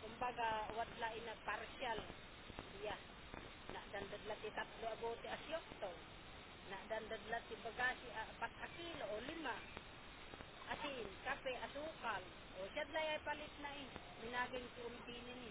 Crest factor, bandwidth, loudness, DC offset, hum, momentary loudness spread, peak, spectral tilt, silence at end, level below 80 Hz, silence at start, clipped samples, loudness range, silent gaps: 20 dB; 4 kHz; -48 LUFS; under 0.1%; none; 12 LU; -28 dBFS; -1.5 dB/octave; 0 s; -66 dBFS; 0 s; under 0.1%; 3 LU; none